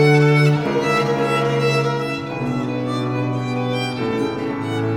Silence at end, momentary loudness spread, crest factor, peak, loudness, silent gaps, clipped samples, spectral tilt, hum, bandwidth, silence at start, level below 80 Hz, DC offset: 0 s; 8 LU; 16 dB; -4 dBFS; -19 LUFS; none; under 0.1%; -6.5 dB/octave; none; 14.5 kHz; 0 s; -52 dBFS; under 0.1%